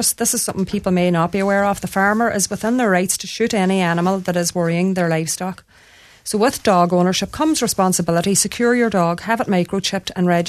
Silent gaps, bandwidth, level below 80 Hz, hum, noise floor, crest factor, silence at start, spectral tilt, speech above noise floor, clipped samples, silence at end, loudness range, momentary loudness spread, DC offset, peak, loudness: none; 14 kHz; -50 dBFS; none; -47 dBFS; 16 dB; 0 s; -4.5 dB/octave; 30 dB; under 0.1%; 0 s; 3 LU; 5 LU; under 0.1%; -2 dBFS; -18 LUFS